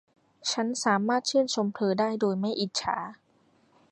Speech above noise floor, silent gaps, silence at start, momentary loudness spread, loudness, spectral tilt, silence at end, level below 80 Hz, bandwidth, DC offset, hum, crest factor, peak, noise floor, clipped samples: 38 dB; none; 0.45 s; 7 LU; -28 LUFS; -4 dB/octave; 0.75 s; -70 dBFS; 11.5 kHz; under 0.1%; none; 18 dB; -10 dBFS; -65 dBFS; under 0.1%